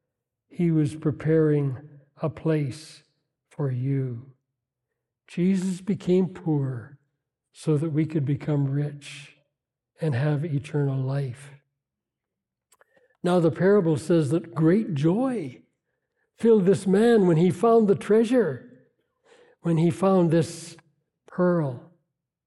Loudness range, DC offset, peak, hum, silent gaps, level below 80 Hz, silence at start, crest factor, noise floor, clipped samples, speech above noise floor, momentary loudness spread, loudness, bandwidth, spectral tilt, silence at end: 8 LU; under 0.1%; -8 dBFS; none; none; -68 dBFS; 0.6 s; 16 dB; -86 dBFS; under 0.1%; 63 dB; 15 LU; -24 LUFS; 12 kHz; -8 dB/octave; 0.7 s